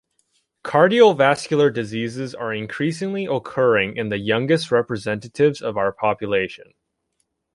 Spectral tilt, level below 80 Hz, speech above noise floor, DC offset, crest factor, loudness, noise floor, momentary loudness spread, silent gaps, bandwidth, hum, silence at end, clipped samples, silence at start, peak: -6 dB/octave; -58 dBFS; 53 dB; under 0.1%; 18 dB; -20 LUFS; -73 dBFS; 12 LU; none; 11.5 kHz; none; 1 s; under 0.1%; 0.65 s; -2 dBFS